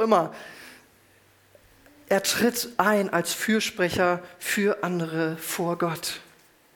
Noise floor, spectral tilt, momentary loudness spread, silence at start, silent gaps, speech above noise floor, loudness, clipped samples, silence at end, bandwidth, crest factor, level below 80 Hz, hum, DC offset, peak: -59 dBFS; -4 dB/octave; 10 LU; 0 s; none; 34 dB; -25 LUFS; under 0.1%; 0.55 s; 19.5 kHz; 22 dB; -62 dBFS; none; under 0.1%; -4 dBFS